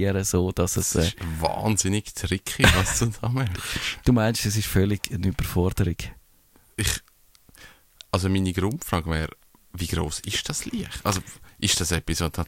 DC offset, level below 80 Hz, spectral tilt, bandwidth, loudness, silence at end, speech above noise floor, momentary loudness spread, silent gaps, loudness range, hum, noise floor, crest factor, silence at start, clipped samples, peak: under 0.1%; -38 dBFS; -4 dB/octave; 16.5 kHz; -25 LUFS; 0 s; 33 dB; 8 LU; none; 6 LU; none; -58 dBFS; 24 dB; 0 s; under 0.1%; -2 dBFS